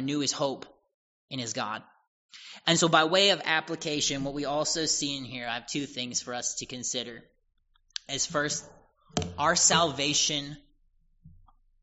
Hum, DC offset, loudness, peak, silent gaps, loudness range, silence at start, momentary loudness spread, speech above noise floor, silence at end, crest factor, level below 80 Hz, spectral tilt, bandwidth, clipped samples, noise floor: none; under 0.1%; -27 LUFS; -6 dBFS; 0.94-1.28 s, 2.08-2.29 s; 7 LU; 0 s; 14 LU; 37 dB; 0.55 s; 24 dB; -60 dBFS; -2 dB/octave; 8 kHz; under 0.1%; -65 dBFS